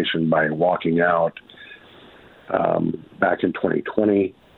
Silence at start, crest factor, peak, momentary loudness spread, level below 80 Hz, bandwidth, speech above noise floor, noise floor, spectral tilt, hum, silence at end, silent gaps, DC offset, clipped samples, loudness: 0 s; 18 dB; -4 dBFS; 14 LU; -58 dBFS; 4.3 kHz; 27 dB; -47 dBFS; -9.5 dB/octave; none; 0.25 s; none; under 0.1%; under 0.1%; -21 LUFS